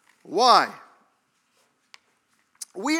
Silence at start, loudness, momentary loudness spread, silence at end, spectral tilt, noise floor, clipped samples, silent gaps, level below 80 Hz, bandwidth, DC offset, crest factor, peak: 0.3 s; -20 LUFS; 22 LU; 0 s; -2 dB/octave; -69 dBFS; under 0.1%; none; under -90 dBFS; 16.5 kHz; under 0.1%; 24 dB; -2 dBFS